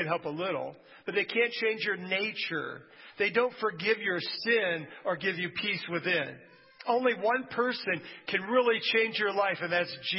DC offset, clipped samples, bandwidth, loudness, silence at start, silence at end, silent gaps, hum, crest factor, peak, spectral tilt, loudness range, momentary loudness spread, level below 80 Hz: under 0.1%; under 0.1%; 5.8 kHz; -29 LUFS; 0 s; 0 s; none; none; 18 dB; -12 dBFS; -8 dB/octave; 2 LU; 8 LU; -78 dBFS